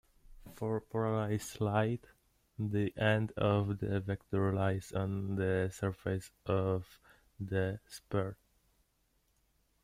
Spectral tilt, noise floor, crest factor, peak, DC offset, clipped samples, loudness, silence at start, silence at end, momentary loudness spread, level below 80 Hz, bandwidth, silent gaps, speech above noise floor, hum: -7 dB/octave; -76 dBFS; 20 dB; -16 dBFS; under 0.1%; under 0.1%; -35 LUFS; 0.3 s; 1.5 s; 9 LU; -62 dBFS; 15.5 kHz; none; 41 dB; none